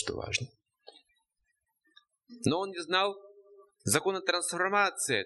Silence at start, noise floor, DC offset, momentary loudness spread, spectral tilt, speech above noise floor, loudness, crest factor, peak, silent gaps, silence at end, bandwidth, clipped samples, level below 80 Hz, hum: 0 s; -80 dBFS; under 0.1%; 7 LU; -3 dB/octave; 50 dB; -30 LUFS; 22 dB; -12 dBFS; none; 0 s; 12 kHz; under 0.1%; -66 dBFS; none